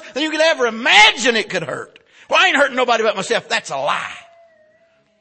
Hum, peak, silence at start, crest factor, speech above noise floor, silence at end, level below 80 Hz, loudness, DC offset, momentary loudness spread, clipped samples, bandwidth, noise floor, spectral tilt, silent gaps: none; 0 dBFS; 0 s; 18 dB; 41 dB; 1 s; -58 dBFS; -15 LUFS; under 0.1%; 14 LU; under 0.1%; 8.8 kHz; -57 dBFS; -1.5 dB/octave; none